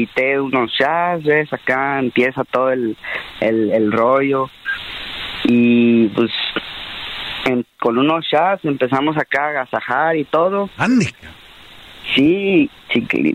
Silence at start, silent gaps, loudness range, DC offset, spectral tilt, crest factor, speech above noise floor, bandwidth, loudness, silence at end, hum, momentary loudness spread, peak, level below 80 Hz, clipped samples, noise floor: 0 s; none; 2 LU; under 0.1%; -6 dB/octave; 14 dB; 24 dB; 10 kHz; -17 LUFS; 0 s; none; 10 LU; -4 dBFS; -52 dBFS; under 0.1%; -40 dBFS